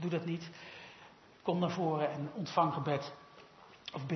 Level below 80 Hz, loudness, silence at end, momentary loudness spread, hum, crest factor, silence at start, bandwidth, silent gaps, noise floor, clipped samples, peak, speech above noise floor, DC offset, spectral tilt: -78 dBFS; -36 LUFS; 0 s; 22 LU; none; 22 dB; 0 s; 6.2 kHz; none; -58 dBFS; under 0.1%; -16 dBFS; 23 dB; under 0.1%; -5.5 dB/octave